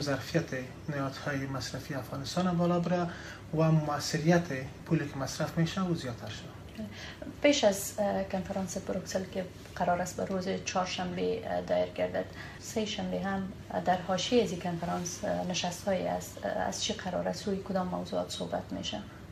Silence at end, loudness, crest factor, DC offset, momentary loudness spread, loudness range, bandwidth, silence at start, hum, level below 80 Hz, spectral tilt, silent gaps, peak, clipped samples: 0 s; -32 LUFS; 20 dB; under 0.1%; 11 LU; 3 LU; 15 kHz; 0 s; none; -56 dBFS; -5 dB/octave; none; -12 dBFS; under 0.1%